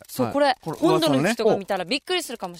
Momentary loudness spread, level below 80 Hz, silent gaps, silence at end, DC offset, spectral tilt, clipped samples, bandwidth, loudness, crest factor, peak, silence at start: 6 LU; -60 dBFS; none; 0 s; under 0.1%; -4.5 dB/octave; under 0.1%; 16 kHz; -22 LUFS; 14 dB; -8 dBFS; 0.1 s